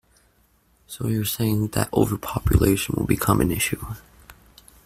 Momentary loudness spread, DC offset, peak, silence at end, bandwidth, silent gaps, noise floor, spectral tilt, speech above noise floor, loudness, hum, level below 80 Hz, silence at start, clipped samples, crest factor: 12 LU; under 0.1%; -2 dBFS; 0.55 s; 16 kHz; none; -62 dBFS; -5.5 dB/octave; 40 dB; -23 LUFS; none; -36 dBFS; 0.9 s; under 0.1%; 20 dB